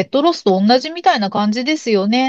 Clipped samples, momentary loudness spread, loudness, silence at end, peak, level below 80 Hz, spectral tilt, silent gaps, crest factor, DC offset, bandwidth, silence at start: under 0.1%; 4 LU; -15 LUFS; 0 s; -2 dBFS; -68 dBFS; -5.5 dB/octave; none; 14 dB; under 0.1%; 8 kHz; 0 s